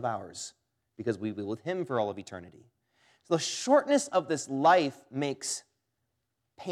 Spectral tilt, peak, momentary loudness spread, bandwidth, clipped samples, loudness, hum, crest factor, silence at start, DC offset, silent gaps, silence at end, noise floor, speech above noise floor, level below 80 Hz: -4 dB/octave; -12 dBFS; 18 LU; 14 kHz; under 0.1%; -29 LUFS; none; 20 dB; 0 s; under 0.1%; none; 0 s; -82 dBFS; 52 dB; -82 dBFS